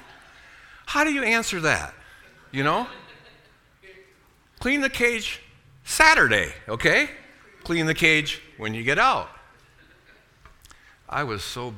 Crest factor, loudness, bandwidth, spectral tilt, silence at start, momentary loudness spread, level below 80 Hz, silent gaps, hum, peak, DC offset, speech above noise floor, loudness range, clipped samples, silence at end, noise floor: 26 dB; -22 LUFS; 18.5 kHz; -3.5 dB/octave; 0.85 s; 16 LU; -48 dBFS; none; none; 0 dBFS; under 0.1%; 35 dB; 7 LU; under 0.1%; 0 s; -58 dBFS